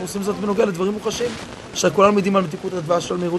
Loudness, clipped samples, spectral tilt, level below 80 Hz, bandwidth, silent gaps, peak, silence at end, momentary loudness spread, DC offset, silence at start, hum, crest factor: -20 LUFS; under 0.1%; -5 dB/octave; -52 dBFS; 13 kHz; none; 0 dBFS; 0 s; 11 LU; under 0.1%; 0 s; none; 20 dB